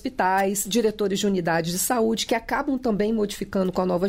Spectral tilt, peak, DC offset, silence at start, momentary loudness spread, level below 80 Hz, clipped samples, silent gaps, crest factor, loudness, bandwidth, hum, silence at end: -4 dB/octave; -10 dBFS; under 0.1%; 0.05 s; 3 LU; -48 dBFS; under 0.1%; none; 14 dB; -23 LUFS; 16 kHz; none; 0 s